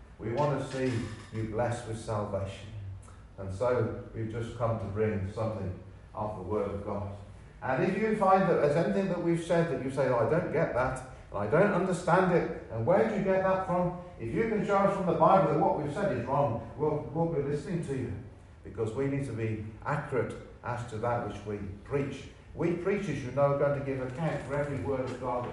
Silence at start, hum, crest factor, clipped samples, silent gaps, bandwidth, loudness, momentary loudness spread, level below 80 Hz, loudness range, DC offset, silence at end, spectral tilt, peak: 0 s; none; 20 dB; under 0.1%; none; 11.5 kHz; -30 LUFS; 14 LU; -54 dBFS; 7 LU; under 0.1%; 0 s; -7.5 dB/octave; -10 dBFS